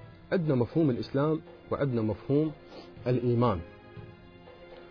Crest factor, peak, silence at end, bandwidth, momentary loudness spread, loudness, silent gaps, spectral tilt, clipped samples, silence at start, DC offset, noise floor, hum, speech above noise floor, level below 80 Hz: 16 dB; -14 dBFS; 0 s; 5.4 kHz; 21 LU; -29 LUFS; none; -10 dB/octave; under 0.1%; 0 s; under 0.1%; -51 dBFS; none; 22 dB; -56 dBFS